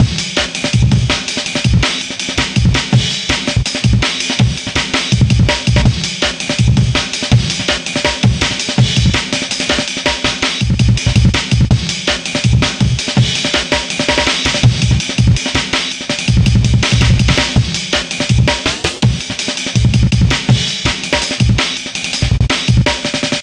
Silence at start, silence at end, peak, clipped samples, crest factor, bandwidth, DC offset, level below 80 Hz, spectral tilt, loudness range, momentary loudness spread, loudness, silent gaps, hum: 0 s; 0 s; 0 dBFS; under 0.1%; 14 dB; 10.5 kHz; under 0.1%; -22 dBFS; -4 dB/octave; 1 LU; 4 LU; -13 LUFS; none; none